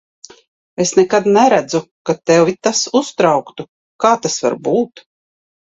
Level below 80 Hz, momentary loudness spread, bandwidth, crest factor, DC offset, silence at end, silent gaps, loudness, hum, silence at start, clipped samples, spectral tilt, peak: -58 dBFS; 12 LU; 8.2 kHz; 16 dB; under 0.1%; 0.7 s; 1.91-2.05 s, 3.68-3.99 s; -15 LUFS; none; 0.8 s; under 0.1%; -4 dB/octave; 0 dBFS